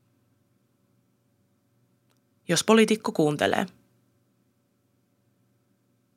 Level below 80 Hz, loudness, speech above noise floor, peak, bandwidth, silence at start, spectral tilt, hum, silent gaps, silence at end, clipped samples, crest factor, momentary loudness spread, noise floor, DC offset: -76 dBFS; -23 LUFS; 47 dB; -4 dBFS; 15.5 kHz; 2.5 s; -4 dB/octave; none; none; 2.5 s; under 0.1%; 24 dB; 12 LU; -70 dBFS; under 0.1%